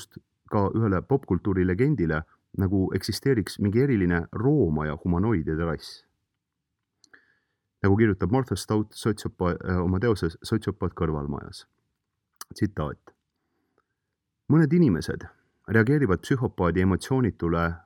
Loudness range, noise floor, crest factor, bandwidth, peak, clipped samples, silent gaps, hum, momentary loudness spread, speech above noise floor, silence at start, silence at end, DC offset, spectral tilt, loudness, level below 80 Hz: 7 LU; -82 dBFS; 20 dB; 17.5 kHz; -6 dBFS; under 0.1%; none; none; 10 LU; 58 dB; 0 s; 0.05 s; under 0.1%; -7.5 dB/octave; -25 LUFS; -46 dBFS